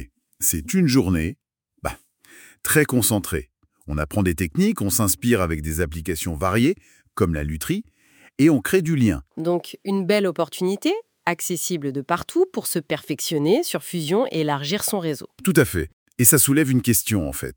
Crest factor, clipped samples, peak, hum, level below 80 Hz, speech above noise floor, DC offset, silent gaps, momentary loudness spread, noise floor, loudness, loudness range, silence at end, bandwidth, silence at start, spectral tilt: 22 dB; under 0.1%; 0 dBFS; none; -44 dBFS; 29 dB; under 0.1%; 15.93-16.06 s; 10 LU; -50 dBFS; -21 LUFS; 4 LU; 0.05 s; over 20 kHz; 0 s; -4.5 dB/octave